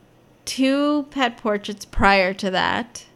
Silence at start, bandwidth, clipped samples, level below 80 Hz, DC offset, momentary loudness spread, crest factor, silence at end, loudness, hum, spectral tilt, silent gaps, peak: 0.45 s; 14.5 kHz; under 0.1%; -38 dBFS; under 0.1%; 12 LU; 20 dB; 0.1 s; -21 LUFS; none; -4 dB/octave; none; -2 dBFS